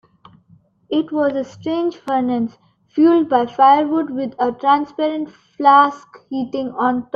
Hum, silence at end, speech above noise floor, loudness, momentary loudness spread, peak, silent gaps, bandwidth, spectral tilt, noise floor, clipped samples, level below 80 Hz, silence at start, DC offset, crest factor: none; 0.1 s; 36 dB; -17 LUFS; 13 LU; 0 dBFS; none; 7 kHz; -6.5 dB/octave; -53 dBFS; under 0.1%; -62 dBFS; 0.9 s; under 0.1%; 16 dB